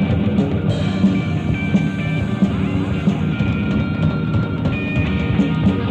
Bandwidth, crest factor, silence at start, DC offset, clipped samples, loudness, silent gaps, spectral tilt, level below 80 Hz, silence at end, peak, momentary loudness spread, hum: 8.4 kHz; 14 dB; 0 s; under 0.1%; under 0.1%; -19 LUFS; none; -8.5 dB/octave; -34 dBFS; 0 s; -4 dBFS; 3 LU; none